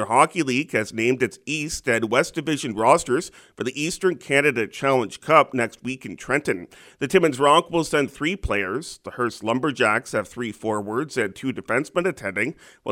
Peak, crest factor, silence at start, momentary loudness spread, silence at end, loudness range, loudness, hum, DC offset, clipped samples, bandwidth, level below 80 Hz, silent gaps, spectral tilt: 0 dBFS; 22 dB; 0 s; 11 LU; 0 s; 4 LU; -22 LUFS; none; under 0.1%; under 0.1%; 16.5 kHz; -48 dBFS; none; -4.5 dB/octave